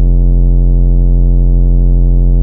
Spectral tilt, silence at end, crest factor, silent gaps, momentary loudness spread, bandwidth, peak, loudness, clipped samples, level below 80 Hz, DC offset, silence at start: -13.5 dB/octave; 0 s; 6 dB; none; 0 LU; 1 kHz; 0 dBFS; -12 LUFS; under 0.1%; -8 dBFS; under 0.1%; 0 s